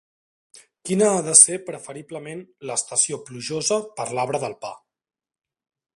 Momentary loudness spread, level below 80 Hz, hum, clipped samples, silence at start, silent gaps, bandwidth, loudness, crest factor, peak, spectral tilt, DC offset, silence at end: 23 LU; -70 dBFS; none; under 0.1%; 0.85 s; none; 14 kHz; -19 LUFS; 24 dB; 0 dBFS; -2.5 dB/octave; under 0.1%; 1.2 s